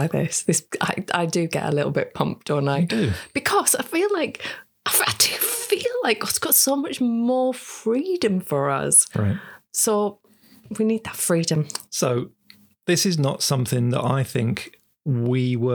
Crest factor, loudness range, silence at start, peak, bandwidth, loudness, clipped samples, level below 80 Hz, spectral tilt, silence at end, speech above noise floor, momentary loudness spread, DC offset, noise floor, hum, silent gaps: 18 dB; 4 LU; 0 s; -4 dBFS; over 20 kHz; -21 LUFS; under 0.1%; -58 dBFS; -4 dB/octave; 0 s; 32 dB; 10 LU; under 0.1%; -54 dBFS; none; none